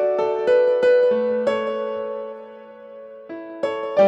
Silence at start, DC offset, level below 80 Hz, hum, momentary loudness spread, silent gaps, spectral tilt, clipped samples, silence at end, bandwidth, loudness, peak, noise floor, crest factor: 0 s; under 0.1%; -72 dBFS; none; 23 LU; none; -6 dB/octave; under 0.1%; 0 s; 7.8 kHz; -20 LUFS; -6 dBFS; -40 dBFS; 14 dB